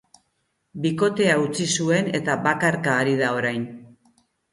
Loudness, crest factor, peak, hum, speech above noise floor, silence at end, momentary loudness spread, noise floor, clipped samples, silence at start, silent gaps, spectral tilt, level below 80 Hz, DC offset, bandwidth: -22 LUFS; 20 dB; -4 dBFS; none; 51 dB; 0.65 s; 7 LU; -72 dBFS; under 0.1%; 0.75 s; none; -4.5 dB/octave; -64 dBFS; under 0.1%; 11.5 kHz